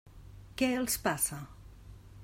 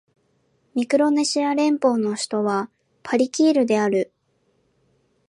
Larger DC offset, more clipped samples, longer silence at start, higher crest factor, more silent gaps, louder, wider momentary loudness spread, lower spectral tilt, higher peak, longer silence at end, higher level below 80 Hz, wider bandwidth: neither; neither; second, 0.05 s vs 0.75 s; about the same, 20 dB vs 16 dB; neither; second, -31 LUFS vs -21 LUFS; first, 24 LU vs 10 LU; second, -3 dB/octave vs -4.5 dB/octave; second, -16 dBFS vs -6 dBFS; second, 0 s vs 1.25 s; first, -54 dBFS vs -74 dBFS; first, 16 kHz vs 11.5 kHz